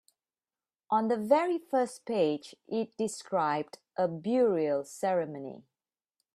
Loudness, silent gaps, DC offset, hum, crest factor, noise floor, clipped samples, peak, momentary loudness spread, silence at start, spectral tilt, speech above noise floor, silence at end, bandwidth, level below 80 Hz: -30 LUFS; none; under 0.1%; none; 20 dB; under -90 dBFS; under 0.1%; -10 dBFS; 10 LU; 0.9 s; -5.5 dB/octave; over 60 dB; 0.75 s; 14 kHz; -78 dBFS